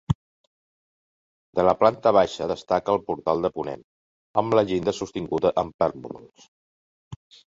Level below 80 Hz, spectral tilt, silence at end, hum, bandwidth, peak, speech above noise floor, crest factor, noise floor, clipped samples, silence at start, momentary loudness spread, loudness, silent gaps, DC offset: -52 dBFS; -6.5 dB/octave; 0.3 s; none; 7.8 kHz; -4 dBFS; over 67 dB; 22 dB; under -90 dBFS; under 0.1%; 0.1 s; 13 LU; -24 LUFS; 0.15-1.53 s, 3.84-4.34 s, 5.74-5.79 s, 6.48-7.11 s; under 0.1%